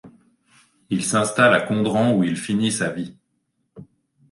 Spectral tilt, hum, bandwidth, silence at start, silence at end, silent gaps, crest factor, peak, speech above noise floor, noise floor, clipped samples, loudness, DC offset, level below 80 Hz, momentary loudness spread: -4.5 dB/octave; none; 11.5 kHz; 0.05 s; 0.45 s; none; 18 dB; -4 dBFS; 52 dB; -72 dBFS; under 0.1%; -20 LUFS; under 0.1%; -60 dBFS; 11 LU